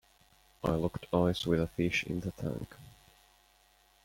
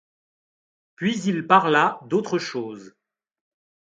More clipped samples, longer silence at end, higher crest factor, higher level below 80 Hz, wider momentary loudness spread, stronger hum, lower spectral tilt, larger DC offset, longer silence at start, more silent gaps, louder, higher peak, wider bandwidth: neither; about the same, 1.15 s vs 1.05 s; about the same, 20 dB vs 24 dB; first, -54 dBFS vs -72 dBFS; second, 11 LU vs 15 LU; neither; first, -6.5 dB/octave vs -5 dB/octave; neither; second, 0.65 s vs 1 s; neither; second, -33 LUFS vs -22 LUFS; second, -14 dBFS vs -2 dBFS; first, 16.5 kHz vs 9.2 kHz